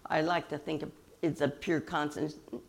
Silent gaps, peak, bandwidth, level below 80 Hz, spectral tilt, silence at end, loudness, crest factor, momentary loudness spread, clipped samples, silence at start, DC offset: none; -14 dBFS; 16 kHz; -64 dBFS; -6 dB/octave; 0.05 s; -34 LUFS; 20 dB; 8 LU; under 0.1%; 0.05 s; under 0.1%